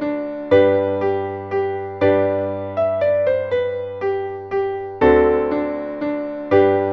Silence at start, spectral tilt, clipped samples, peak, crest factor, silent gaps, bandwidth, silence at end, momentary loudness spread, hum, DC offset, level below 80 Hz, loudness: 0 s; -8.5 dB/octave; under 0.1%; -2 dBFS; 16 dB; none; 5.8 kHz; 0 s; 10 LU; none; under 0.1%; -44 dBFS; -19 LUFS